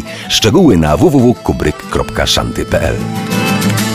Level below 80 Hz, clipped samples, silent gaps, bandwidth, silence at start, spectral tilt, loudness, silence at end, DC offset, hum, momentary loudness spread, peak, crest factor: -28 dBFS; under 0.1%; none; 16 kHz; 0 s; -5 dB/octave; -12 LUFS; 0 s; under 0.1%; none; 8 LU; 0 dBFS; 12 dB